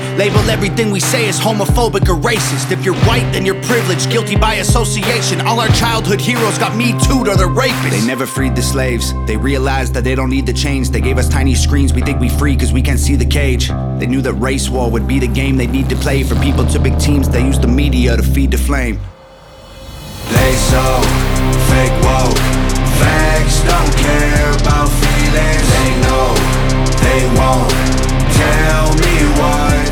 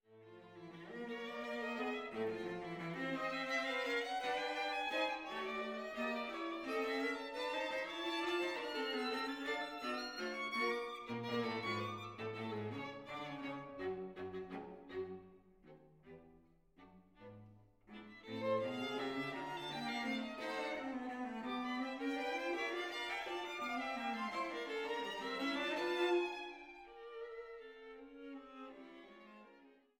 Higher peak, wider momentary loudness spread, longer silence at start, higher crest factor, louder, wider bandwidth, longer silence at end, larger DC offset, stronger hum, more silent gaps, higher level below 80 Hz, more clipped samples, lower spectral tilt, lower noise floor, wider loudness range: first, 0 dBFS vs -26 dBFS; second, 4 LU vs 16 LU; about the same, 0 s vs 0.1 s; second, 12 dB vs 18 dB; first, -13 LUFS vs -41 LUFS; first, over 20 kHz vs 17 kHz; second, 0 s vs 0.25 s; neither; neither; neither; first, -16 dBFS vs -76 dBFS; neither; about the same, -5 dB/octave vs -4.5 dB/octave; second, -37 dBFS vs -68 dBFS; second, 3 LU vs 10 LU